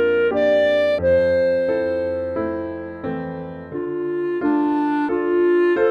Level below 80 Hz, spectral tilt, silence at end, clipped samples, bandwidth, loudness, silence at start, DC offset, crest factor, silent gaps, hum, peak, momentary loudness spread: -50 dBFS; -7.5 dB/octave; 0 s; under 0.1%; 6.2 kHz; -20 LUFS; 0 s; under 0.1%; 12 dB; none; none; -8 dBFS; 12 LU